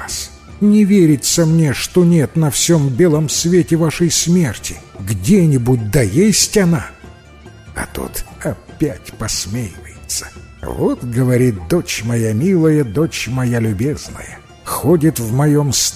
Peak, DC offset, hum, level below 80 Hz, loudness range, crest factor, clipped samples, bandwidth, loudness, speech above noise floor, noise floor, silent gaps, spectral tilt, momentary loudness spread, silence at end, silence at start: 0 dBFS; under 0.1%; none; -36 dBFS; 9 LU; 14 dB; under 0.1%; 16 kHz; -15 LUFS; 25 dB; -39 dBFS; none; -5 dB/octave; 14 LU; 0 s; 0 s